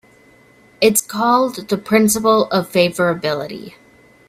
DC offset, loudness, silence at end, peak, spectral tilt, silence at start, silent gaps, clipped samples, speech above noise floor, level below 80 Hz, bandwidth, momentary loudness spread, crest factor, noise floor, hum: under 0.1%; -16 LUFS; 0.6 s; 0 dBFS; -4 dB/octave; 0.8 s; none; under 0.1%; 33 dB; -56 dBFS; 16 kHz; 9 LU; 18 dB; -49 dBFS; none